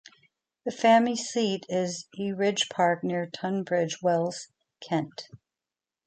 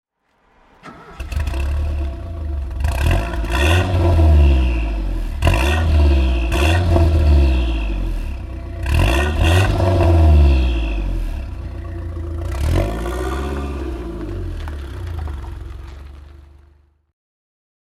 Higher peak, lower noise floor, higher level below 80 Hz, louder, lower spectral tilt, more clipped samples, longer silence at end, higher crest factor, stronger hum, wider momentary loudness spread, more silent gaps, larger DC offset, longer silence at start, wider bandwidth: second, -10 dBFS vs -2 dBFS; first, under -90 dBFS vs -60 dBFS; second, -76 dBFS vs -20 dBFS; second, -27 LUFS vs -18 LUFS; second, -4.5 dB/octave vs -6.5 dB/octave; neither; second, 0.7 s vs 1.45 s; about the same, 18 dB vs 16 dB; neither; about the same, 15 LU vs 16 LU; neither; neither; second, 0.65 s vs 0.85 s; second, 9.2 kHz vs 13 kHz